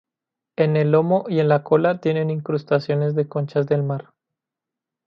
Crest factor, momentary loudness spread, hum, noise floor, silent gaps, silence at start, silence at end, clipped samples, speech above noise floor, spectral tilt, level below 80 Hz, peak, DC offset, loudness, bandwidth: 18 dB; 7 LU; none; -86 dBFS; none; 0.6 s; 1.05 s; under 0.1%; 67 dB; -9.5 dB/octave; -68 dBFS; -4 dBFS; under 0.1%; -20 LUFS; 5.8 kHz